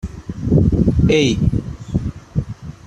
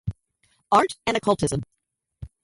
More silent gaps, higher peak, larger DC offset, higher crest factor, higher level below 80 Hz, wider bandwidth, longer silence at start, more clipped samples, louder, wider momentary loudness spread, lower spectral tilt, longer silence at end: neither; first, -2 dBFS vs -6 dBFS; neither; second, 14 dB vs 20 dB; first, -28 dBFS vs -48 dBFS; second, 10 kHz vs 11.5 kHz; about the same, 0.05 s vs 0.05 s; neither; first, -18 LUFS vs -23 LUFS; second, 12 LU vs 24 LU; first, -7 dB/octave vs -5 dB/octave; second, 0 s vs 0.15 s